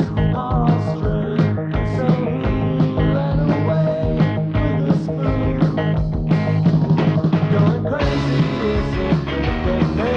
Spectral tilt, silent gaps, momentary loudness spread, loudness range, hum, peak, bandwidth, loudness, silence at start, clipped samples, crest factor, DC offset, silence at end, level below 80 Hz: -9 dB/octave; none; 4 LU; 1 LU; none; -4 dBFS; 6.4 kHz; -19 LUFS; 0 s; under 0.1%; 14 dB; under 0.1%; 0 s; -30 dBFS